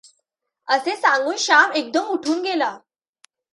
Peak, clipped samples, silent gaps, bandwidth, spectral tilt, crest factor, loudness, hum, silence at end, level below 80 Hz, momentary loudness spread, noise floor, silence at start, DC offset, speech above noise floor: -2 dBFS; under 0.1%; none; 11.5 kHz; -0.5 dB/octave; 20 dB; -19 LUFS; none; 0.75 s; -78 dBFS; 8 LU; -75 dBFS; 0.65 s; under 0.1%; 56 dB